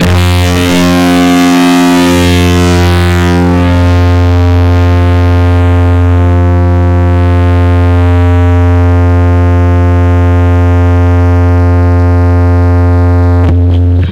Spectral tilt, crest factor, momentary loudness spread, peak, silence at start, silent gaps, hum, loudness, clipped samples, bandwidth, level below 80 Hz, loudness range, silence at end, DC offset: -7 dB/octave; 4 dB; 2 LU; -2 dBFS; 0 s; none; none; -7 LUFS; under 0.1%; 13.5 kHz; -18 dBFS; 1 LU; 0 s; under 0.1%